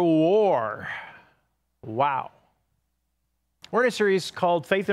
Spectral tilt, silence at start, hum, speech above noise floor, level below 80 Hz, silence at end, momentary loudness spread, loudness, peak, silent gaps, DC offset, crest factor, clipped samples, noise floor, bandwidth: -5.5 dB/octave; 0 s; none; 53 dB; -72 dBFS; 0 s; 17 LU; -24 LUFS; -8 dBFS; none; under 0.1%; 18 dB; under 0.1%; -76 dBFS; 13 kHz